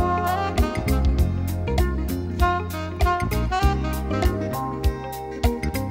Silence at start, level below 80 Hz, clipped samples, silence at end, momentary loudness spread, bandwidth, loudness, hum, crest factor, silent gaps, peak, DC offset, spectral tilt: 0 s; -26 dBFS; under 0.1%; 0 s; 5 LU; 16.5 kHz; -24 LUFS; none; 16 dB; none; -6 dBFS; under 0.1%; -6.5 dB/octave